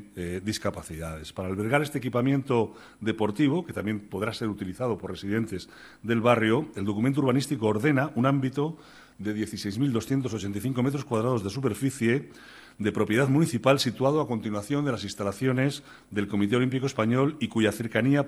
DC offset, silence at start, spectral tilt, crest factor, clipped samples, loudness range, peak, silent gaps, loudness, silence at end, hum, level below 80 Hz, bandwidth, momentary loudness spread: under 0.1%; 0 s; -6.5 dB/octave; 22 dB; under 0.1%; 3 LU; -6 dBFS; none; -27 LUFS; 0 s; none; -58 dBFS; 13 kHz; 10 LU